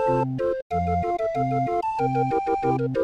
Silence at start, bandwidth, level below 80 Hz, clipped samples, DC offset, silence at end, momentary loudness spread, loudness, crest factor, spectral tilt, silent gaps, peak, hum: 0 s; 8.8 kHz; -48 dBFS; under 0.1%; under 0.1%; 0 s; 2 LU; -24 LUFS; 12 dB; -9 dB/octave; 0.62-0.70 s; -12 dBFS; none